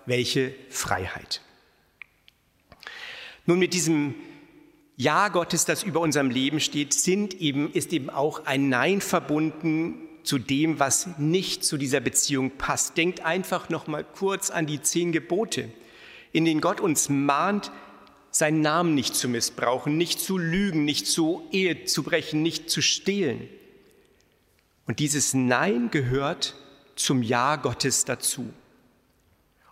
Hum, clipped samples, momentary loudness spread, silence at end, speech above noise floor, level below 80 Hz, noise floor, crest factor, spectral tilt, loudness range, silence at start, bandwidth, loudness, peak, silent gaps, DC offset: none; under 0.1%; 9 LU; 1.2 s; 40 dB; -58 dBFS; -65 dBFS; 20 dB; -3.5 dB/octave; 3 LU; 0.05 s; 16 kHz; -25 LUFS; -6 dBFS; none; under 0.1%